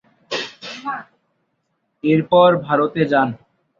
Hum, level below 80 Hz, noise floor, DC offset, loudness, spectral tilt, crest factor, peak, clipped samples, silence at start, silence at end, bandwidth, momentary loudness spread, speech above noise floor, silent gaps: none; -62 dBFS; -70 dBFS; under 0.1%; -18 LUFS; -6.5 dB/octave; 18 dB; -2 dBFS; under 0.1%; 0.3 s; 0.45 s; 7.4 kHz; 16 LU; 54 dB; none